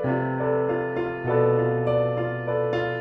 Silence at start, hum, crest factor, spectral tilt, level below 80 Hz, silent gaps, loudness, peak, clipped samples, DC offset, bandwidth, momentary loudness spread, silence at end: 0 s; none; 14 dB; -9.5 dB/octave; -54 dBFS; none; -24 LUFS; -10 dBFS; under 0.1%; under 0.1%; 5.6 kHz; 5 LU; 0 s